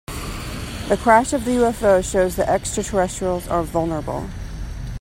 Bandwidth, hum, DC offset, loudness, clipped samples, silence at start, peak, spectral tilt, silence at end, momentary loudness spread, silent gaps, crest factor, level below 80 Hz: 16.5 kHz; none; under 0.1%; -20 LUFS; under 0.1%; 0.1 s; 0 dBFS; -5 dB/octave; 0 s; 15 LU; none; 20 dB; -34 dBFS